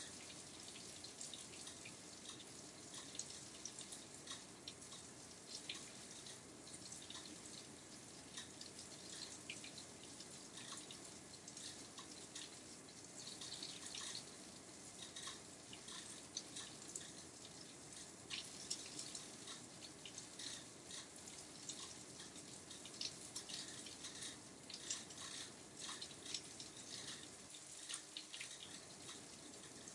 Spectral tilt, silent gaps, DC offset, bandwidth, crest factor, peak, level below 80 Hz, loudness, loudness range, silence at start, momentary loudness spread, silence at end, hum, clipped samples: -1 dB/octave; none; under 0.1%; 12 kHz; 26 dB; -28 dBFS; -82 dBFS; -51 LUFS; 3 LU; 0 s; 7 LU; 0 s; none; under 0.1%